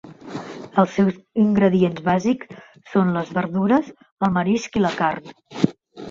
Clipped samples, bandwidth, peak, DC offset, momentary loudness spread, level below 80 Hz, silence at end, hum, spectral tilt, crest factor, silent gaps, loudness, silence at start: under 0.1%; 7.4 kHz; 0 dBFS; under 0.1%; 16 LU; -56 dBFS; 0 s; none; -7 dB/octave; 20 dB; 4.12-4.17 s; -21 LUFS; 0.05 s